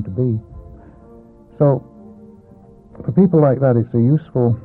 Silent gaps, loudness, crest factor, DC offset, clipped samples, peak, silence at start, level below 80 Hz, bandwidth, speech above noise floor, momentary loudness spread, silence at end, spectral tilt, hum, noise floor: none; -16 LUFS; 16 dB; under 0.1%; under 0.1%; -2 dBFS; 0 s; -46 dBFS; 2.6 kHz; 29 dB; 9 LU; 0.05 s; -13.5 dB/octave; none; -44 dBFS